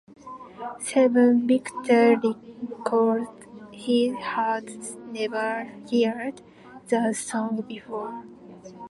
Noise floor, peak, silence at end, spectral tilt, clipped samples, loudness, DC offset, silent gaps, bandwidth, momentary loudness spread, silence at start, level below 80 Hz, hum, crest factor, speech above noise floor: -44 dBFS; -8 dBFS; 0 s; -4.5 dB/octave; under 0.1%; -24 LUFS; under 0.1%; none; 11.5 kHz; 18 LU; 0.1 s; -70 dBFS; none; 18 dB; 20 dB